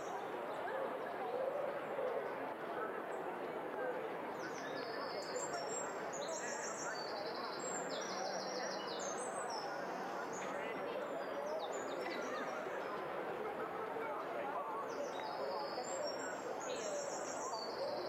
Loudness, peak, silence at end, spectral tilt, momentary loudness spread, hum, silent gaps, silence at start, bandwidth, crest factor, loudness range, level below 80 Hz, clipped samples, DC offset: -42 LUFS; -28 dBFS; 0 s; -2.5 dB/octave; 2 LU; none; none; 0 s; 16 kHz; 14 dB; 1 LU; -84 dBFS; under 0.1%; under 0.1%